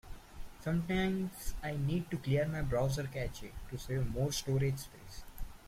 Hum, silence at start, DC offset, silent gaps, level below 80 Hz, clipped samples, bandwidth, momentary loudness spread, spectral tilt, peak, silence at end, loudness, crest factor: none; 0.05 s; under 0.1%; none; -48 dBFS; under 0.1%; 16 kHz; 18 LU; -6 dB/octave; -20 dBFS; 0 s; -36 LUFS; 16 dB